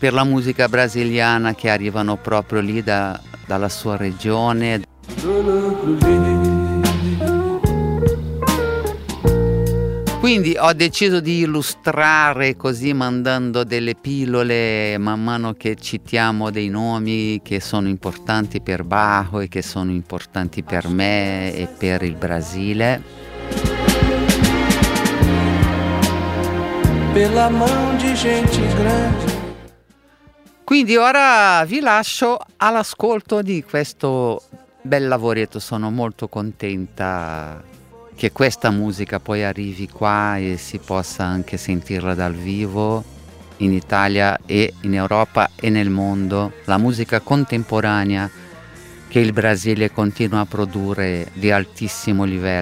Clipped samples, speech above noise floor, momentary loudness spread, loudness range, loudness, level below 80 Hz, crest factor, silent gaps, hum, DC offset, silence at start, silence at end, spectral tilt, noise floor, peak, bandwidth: under 0.1%; 34 dB; 9 LU; 6 LU; -18 LUFS; -34 dBFS; 18 dB; none; none; under 0.1%; 0 s; 0 s; -5.5 dB/octave; -52 dBFS; 0 dBFS; 16 kHz